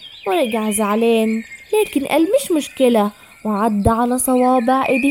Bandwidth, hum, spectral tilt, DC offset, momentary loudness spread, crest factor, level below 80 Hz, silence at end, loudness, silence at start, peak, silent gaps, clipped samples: 17 kHz; none; -4.5 dB/octave; under 0.1%; 6 LU; 14 dB; -42 dBFS; 0 s; -17 LUFS; 0 s; -2 dBFS; none; under 0.1%